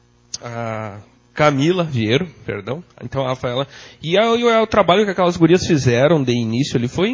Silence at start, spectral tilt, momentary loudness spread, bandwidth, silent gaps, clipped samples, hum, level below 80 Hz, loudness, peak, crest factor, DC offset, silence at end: 0.35 s; -6 dB/octave; 15 LU; 7.6 kHz; none; under 0.1%; none; -46 dBFS; -17 LUFS; 0 dBFS; 16 dB; under 0.1%; 0 s